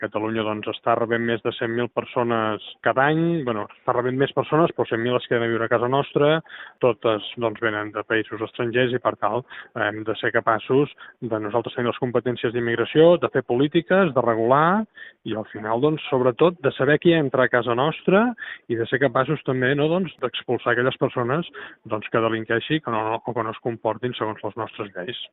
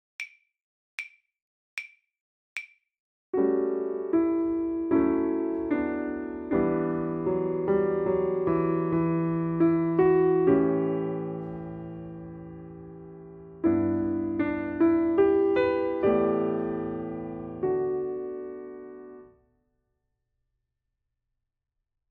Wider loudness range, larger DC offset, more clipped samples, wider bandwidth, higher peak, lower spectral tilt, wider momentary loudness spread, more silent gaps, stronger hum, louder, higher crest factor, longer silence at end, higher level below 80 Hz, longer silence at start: second, 4 LU vs 10 LU; neither; neither; second, 4.1 kHz vs 6 kHz; first, -2 dBFS vs -12 dBFS; second, -4.5 dB/octave vs -9 dB/octave; second, 9 LU vs 19 LU; second, none vs 0.62-0.98 s, 1.42-1.77 s, 2.21-2.56 s, 2.99-3.33 s; neither; first, -22 LUFS vs -26 LUFS; about the same, 20 dB vs 16 dB; second, 0.05 s vs 2.85 s; second, -62 dBFS vs -56 dBFS; second, 0 s vs 0.2 s